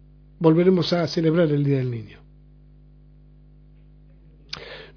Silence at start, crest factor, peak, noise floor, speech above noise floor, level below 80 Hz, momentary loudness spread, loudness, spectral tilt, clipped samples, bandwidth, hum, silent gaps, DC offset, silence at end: 0.4 s; 20 dB; -4 dBFS; -50 dBFS; 30 dB; -52 dBFS; 18 LU; -20 LUFS; -8 dB/octave; under 0.1%; 5.4 kHz; 50 Hz at -50 dBFS; none; under 0.1%; 0.1 s